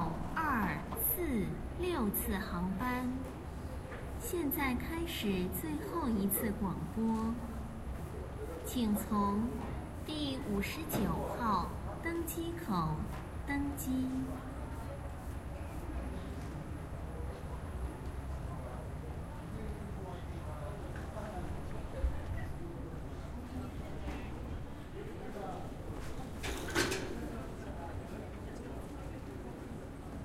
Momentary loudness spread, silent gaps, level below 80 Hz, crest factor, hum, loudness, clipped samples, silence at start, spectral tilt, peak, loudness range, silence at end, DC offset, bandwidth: 11 LU; none; -46 dBFS; 22 dB; none; -39 LUFS; under 0.1%; 0 s; -5.5 dB/octave; -16 dBFS; 8 LU; 0 s; under 0.1%; 16 kHz